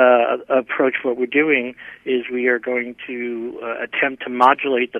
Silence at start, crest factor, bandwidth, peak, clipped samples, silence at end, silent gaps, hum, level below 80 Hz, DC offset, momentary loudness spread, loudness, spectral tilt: 0 s; 18 dB; 6.6 kHz; 0 dBFS; under 0.1%; 0 s; none; none; -66 dBFS; under 0.1%; 12 LU; -19 LUFS; -6 dB/octave